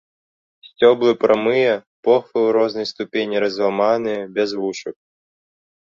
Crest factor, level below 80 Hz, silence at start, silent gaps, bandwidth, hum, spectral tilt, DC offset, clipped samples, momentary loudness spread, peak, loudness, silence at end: 18 dB; -64 dBFS; 0.65 s; 1.87-2.03 s; 7.2 kHz; none; -5 dB/octave; under 0.1%; under 0.1%; 9 LU; -2 dBFS; -18 LUFS; 1.05 s